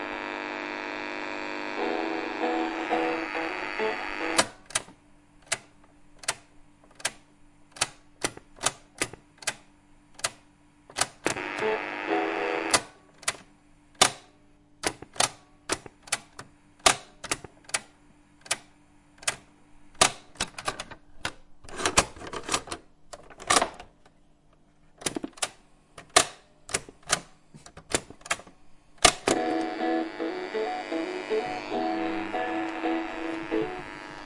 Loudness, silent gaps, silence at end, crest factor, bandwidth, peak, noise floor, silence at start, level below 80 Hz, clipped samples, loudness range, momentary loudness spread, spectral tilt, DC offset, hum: -29 LUFS; none; 0 s; 30 dB; 11.5 kHz; -2 dBFS; -59 dBFS; 0 s; -54 dBFS; under 0.1%; 6 LU; 14 LU; -1.5 dB/octave; under 0.1%; none